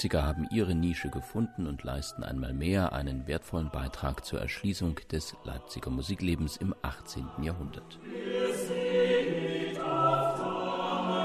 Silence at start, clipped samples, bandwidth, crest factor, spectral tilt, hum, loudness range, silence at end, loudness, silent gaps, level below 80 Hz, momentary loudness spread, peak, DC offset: 0 s; under 0.1%; 13.5 kHz; 18 dB; -6 dB/octave; none; 5 LU; 0 s; -32 LUFS; none; -44 dBFS; 11 LU; -14 dBFS; under 0.1%